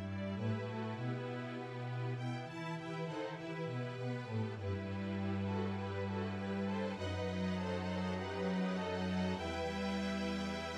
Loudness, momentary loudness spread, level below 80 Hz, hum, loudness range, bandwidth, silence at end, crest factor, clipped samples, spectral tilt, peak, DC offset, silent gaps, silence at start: -40 LUFS; 5 LU; -64 dBFS; none; 4 LU; 10 kHz; 0 s; 12 dB; under 0.1%; -7 dB/octave; -26 dBFS; under 0.1%; none; 0 s